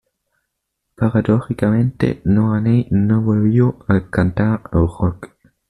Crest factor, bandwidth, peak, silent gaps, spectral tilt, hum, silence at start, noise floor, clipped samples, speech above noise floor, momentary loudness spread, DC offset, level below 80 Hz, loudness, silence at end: 14 dB; 10.5 kHz; -4 dBFS; none; -10 dB/octave; none; 1 s; -75 dBFS; under 0.1%; 59 dB; 4 LU; under 0.1%; -40 dBFS; -17 LUFS; 0.45 s